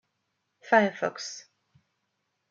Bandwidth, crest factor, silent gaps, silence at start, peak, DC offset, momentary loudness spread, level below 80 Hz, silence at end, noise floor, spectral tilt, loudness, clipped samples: 7.6 kHz; 22 dB; none; 0.65 s; -8 dBFS; under 0.1%; 16 LU; -84 dBFS; 1.1 s; -79 dBFS; -4 dB/octave; -26 LUFS; under 0.1%